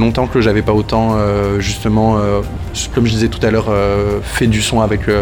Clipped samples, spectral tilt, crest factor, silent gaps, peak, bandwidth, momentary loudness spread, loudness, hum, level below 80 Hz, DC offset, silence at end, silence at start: under 0.1%; -6 dB/octave; 12 dB; none; -2 dBFS; 19.5 kHz; 4 LU; -14 LUFS; none; -26 dBFS; 0.2%; 0 s; 0 s